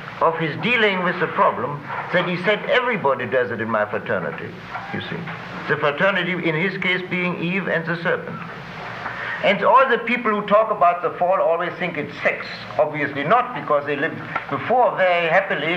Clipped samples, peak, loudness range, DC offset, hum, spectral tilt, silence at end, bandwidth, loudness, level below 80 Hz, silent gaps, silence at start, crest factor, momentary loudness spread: under 0.1%; -4 dBFS; 4 LU; under 0.1%; none; -6.5 dB/octave; 0 s; 8.4 kHz; -20 LUFS; -58 dBFS; none; 0 s; 16 dB; 12 LU